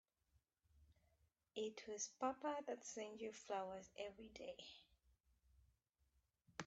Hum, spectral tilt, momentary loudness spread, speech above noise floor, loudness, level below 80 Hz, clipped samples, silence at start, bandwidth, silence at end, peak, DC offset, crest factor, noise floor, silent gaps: none; -2.5 dB/octave; 11 LU; 34 dB; -50 LUFS; -80 dBFS; under 0.1%; 0.75 s; 8.2 kHz; 0 s; -30 dBFS; under 0.1%; 24 dB; -84 dBFS; none